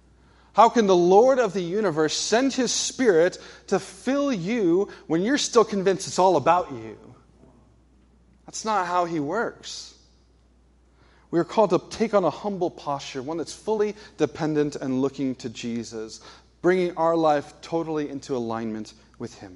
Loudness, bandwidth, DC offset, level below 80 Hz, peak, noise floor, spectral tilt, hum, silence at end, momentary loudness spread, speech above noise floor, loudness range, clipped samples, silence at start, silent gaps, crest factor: -23 LUFS; 11.5 kHz; under 0.1%; -58 dBFS; -2 dBFS; -58 dBFS; -4.5 dB/octave; none; 0 s; 16 LU; 35 dB; 9 LU; under 0.1%; 0.55 s; none; 22 dB